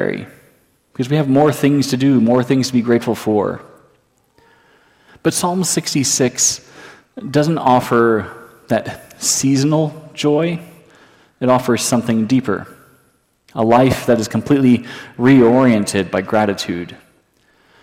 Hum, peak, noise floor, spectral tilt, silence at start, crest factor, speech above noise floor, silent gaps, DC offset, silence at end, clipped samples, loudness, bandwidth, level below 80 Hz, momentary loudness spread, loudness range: none; -2 dBFS; -58 dBFS; -5 dB/octave; 0 s; 14 dB; 43 dB; none; under 0.1%; 0.85 s; under 0.1%; -15 LUFS; 16.5 kHz; -54 dBFS; 12 LU; 5 LU